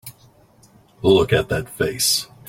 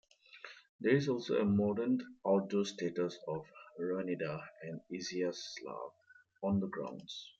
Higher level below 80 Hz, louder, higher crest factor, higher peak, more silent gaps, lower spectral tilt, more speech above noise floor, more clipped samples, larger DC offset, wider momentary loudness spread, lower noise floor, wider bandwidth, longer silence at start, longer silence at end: first, -46 dBFS vs -76 dBFS; first, -19 LUFS vs -36 LUFS; about the same, 20 dB vs 20 dB; first, -2 dBFS vs -16 dBFS; second, none vs 0.69-0.79 s; second, -3.5 dB/octave vs -6 dB/octave; first, 34 dB vs 20 dB; neither; neither; second, 9 LU vs 15 LU; about the same, -52 dBFS vs -55 dBFS; first, 16.5 kHz vs 7.8 kHz; second, 0.05 s vs 0.35 s; first, 0.25 s vs 0.1 s